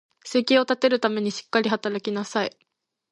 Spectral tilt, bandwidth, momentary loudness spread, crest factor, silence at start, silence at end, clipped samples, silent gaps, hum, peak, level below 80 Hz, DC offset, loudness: -4 dB/octave; 11 kHz; 8 LU; 18 dB; 0.25 s; 0.6 s; under 0.1%; none; none; -6 dBFS; -74 dBFS; under 0.1%; -24 LUFS